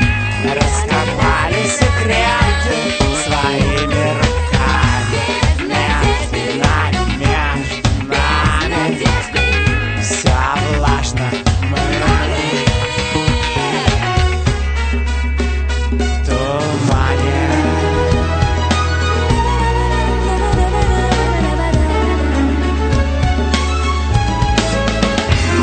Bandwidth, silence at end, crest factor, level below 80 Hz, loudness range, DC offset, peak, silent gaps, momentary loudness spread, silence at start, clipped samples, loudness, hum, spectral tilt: 9.2 kHz; 0 s; 14 dB; -20 dBFS; 2 LU; under 0.1%; 0 dBFS; none; 3 LU; 0 s; under 0.1%; -15 LUFS; none; -5 dB/octave